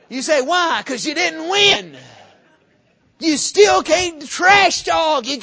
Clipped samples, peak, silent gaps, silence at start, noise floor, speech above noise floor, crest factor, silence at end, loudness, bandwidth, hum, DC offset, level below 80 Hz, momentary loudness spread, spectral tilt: under 0.1%; 0 dBFS; none; 0.1 s; -58 dBFS; 42 dB; 18 dB; 0 s; -15 LUFS; 8 kHz; none; under 0.1%; -52 dBFS; 8 LU; -1.5 dB/octave